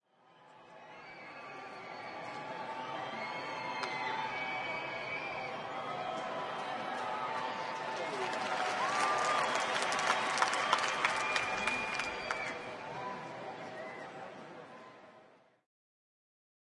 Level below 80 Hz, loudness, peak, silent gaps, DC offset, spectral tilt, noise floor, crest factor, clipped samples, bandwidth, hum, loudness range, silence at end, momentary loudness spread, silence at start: -74 dBFS; -36 LUFS; -12 dBFS; none; under 0.1%; -2 dB/octave; -63 dBFS; 26 dB; under 0.1%; 11.5 kHz; none; 13 LU; 1.25 s; 17 LU; 0.3 s